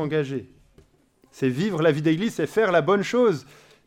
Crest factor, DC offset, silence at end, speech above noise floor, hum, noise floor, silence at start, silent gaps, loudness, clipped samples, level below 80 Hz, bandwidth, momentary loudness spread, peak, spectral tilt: 16 dB; under 0.1%; 0.45 s; 38 dB; none; -60 dBFS; 0 s; none; -23 LUFS; under 0.1%; -64 dBFS; 15.5 kHz; 9 LU; -8 dBFS; -6.5 dB/octave